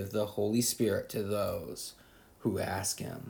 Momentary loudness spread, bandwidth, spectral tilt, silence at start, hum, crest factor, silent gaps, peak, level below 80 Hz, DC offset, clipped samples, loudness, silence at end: 10 LU; 19.5 kHz; -4.5 dB/octave; 0 s; none; 16 dB; none; -16 dBFS; -64 dBFS; under 0.1%; under 0.1%; -33 LUFS; 0 s